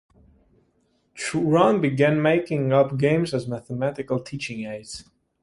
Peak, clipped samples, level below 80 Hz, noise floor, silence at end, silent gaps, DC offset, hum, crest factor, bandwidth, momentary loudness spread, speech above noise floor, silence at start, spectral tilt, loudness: -4 dBFS; under 0.1%; -58 dBFS; -67 dBFS; 0.4 s; none; under 0.1%; none; 20 dB; 11.5 kHz; 14 LU; 45 dB; 1.15 s; -6.5 dB/octave; -23 LUFS